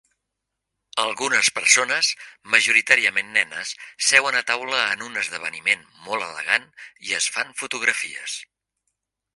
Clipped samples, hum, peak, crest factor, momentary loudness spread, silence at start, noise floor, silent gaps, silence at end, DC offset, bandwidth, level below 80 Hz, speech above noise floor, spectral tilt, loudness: under 0.1%; none; 0 dBFS; 24 dB; 13 LU; 0.95 s; -82 dBFS; none; 0.95 s; under 0.1%; 11.5 kHz; -72 dBFS; 59 dB; 1 dB/octave; -20 LUFS